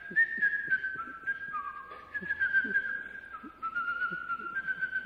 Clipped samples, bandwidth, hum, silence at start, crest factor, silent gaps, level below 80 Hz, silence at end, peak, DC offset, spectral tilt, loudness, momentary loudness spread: under 0.1%; 5.8 kHz; none; 0 s; 16 dB; none; -68 dBFS; 0 s; -18 dBFS; under 0.1%; -5 dB/octave; -32 LUFS; 14 LU